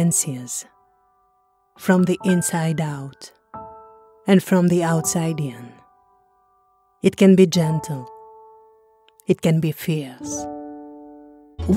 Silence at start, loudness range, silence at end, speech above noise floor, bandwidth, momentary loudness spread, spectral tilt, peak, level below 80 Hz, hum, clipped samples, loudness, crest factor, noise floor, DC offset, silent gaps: 0 s; 6 LU; 0 s; 44 dB; 16.5 kHz; 23 LU; -5.5 dB/octave; -2 dBFS; -50 dBFS; none; under 0.1%; -20 LUFS; 20 dB; -63 dBFS; under 0.1%; none